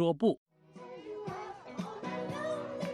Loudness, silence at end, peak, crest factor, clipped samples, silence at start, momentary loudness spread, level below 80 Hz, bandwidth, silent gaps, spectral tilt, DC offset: -37 LUFS; 0 s; -16 dBFS; 20 dB; under 0.1%; 0 s; 15 LU; -74 dBFS; 13 kHz; 0.37-0.46 s; -7 dB/octave; under 0.1%